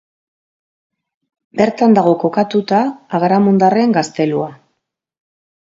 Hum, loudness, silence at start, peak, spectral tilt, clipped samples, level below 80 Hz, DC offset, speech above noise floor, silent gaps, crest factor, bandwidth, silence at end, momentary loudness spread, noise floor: none; -14 LUFS; 1.55 s; 0 dBFS; -7 dB/octave; under 0.1%; -62 dBFS; under 0.1%; 59 dB; none; 16 dB; 7.8 kHz; 1.15 s; 8 LU; -72 dBFS